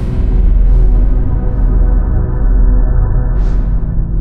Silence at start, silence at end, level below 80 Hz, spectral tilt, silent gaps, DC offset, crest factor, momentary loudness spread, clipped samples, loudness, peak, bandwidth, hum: 0 s; 0 s; -10 dBFS; -11 dB/octave; none; under 0.1%; 8 dB; 4 LU; under 0.1%; -15 LUFS; 0 dBFS; 2 kHz; none